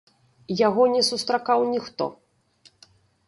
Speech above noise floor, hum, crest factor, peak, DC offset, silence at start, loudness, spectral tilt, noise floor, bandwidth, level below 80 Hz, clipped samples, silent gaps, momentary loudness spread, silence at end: 37 dB; none; 18 dB; -8 dBFS; under 0.1%; 0.5 s; -23 LUFS; -4 dB/octave; -59 dBFS; 11.5 kHz; -68 dBFS; under 0.1%; none; 12 LU; 1.15 s